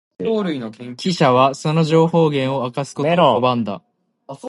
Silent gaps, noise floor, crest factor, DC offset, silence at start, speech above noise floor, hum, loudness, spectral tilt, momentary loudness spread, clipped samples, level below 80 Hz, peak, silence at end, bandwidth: none; -38 dBFS; 16 dB; under 0.1%; 0.2 s; 21 dB; none; -17 LUFS; -6.5 dB/octave; 12 LU; under 0.1%; -64 dBFS; -2 dBFS; 0 s; 11.5 kHz